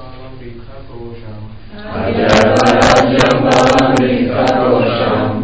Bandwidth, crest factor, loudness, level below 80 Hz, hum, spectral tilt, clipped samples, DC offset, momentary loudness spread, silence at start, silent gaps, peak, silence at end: 8 kHz; 12 dB; -11 LUFS; -34 dBFS; none; -5.5 dB/octave; under 0.1%; 2%; 23 LU; 0 s; none; 0 dBFS; 0 s